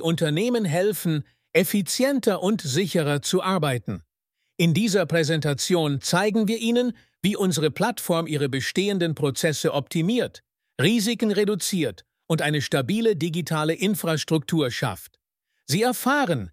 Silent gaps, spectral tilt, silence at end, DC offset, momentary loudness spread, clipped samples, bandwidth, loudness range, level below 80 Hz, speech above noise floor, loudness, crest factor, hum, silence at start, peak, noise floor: none; -5 dB/octave; 0 s; under 0.1%; 5 LU; under 0.1%; 16 kHz; 1 LU; -62 dBFS; 55 dB; -23 LUFS; 18 dB; none; 0 s; -4 dBFS; -78 dBFS